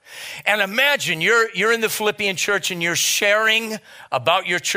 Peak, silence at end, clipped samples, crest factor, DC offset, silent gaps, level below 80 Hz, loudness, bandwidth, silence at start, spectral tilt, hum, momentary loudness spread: -2 dBFS; 0 s; under 0.1%; 18 dB; under 0.1%; none; -66 dBFS; -18 LUFS; 16 kHz; 0.1 s; -1.5 dB/octave; none; 8 LU